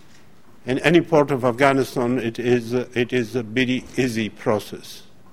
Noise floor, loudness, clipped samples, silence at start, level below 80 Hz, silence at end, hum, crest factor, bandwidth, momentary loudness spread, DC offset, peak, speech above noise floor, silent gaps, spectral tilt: -52 dBFS; -21 LUFS; under 0.1%; 0.65 s; -52 dBFS; 0.3 s; none; 22 dB; 16 kHz; 9 LU; 0.7%; 0 dBFS; 31 dB; none; -6 dB/octave